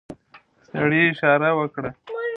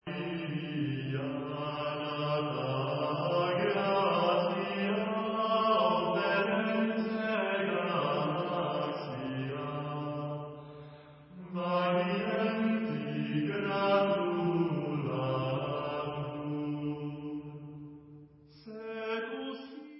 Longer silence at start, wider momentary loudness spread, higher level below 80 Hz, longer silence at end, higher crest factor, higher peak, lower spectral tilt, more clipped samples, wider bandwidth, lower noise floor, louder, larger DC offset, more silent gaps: about the same, 0.1 s vs 0.05 s; about the same, 14 LU vs 13 LU; first, -60 dBFS vs -68 dBFS; about the same, 0 s vs 0 s; about the same, 20 dB vs 16 dB; first, -2 dBFS vs -16 dBFS; first, -8.5 dB/octave vs -4.5 dB/octave; neither; about the same, 6 kHz vs 5.6 kHz; about the same, -53 dBFS vs -55 dBFS; first, -20 LUFS vs -32 LUFS; neither; neither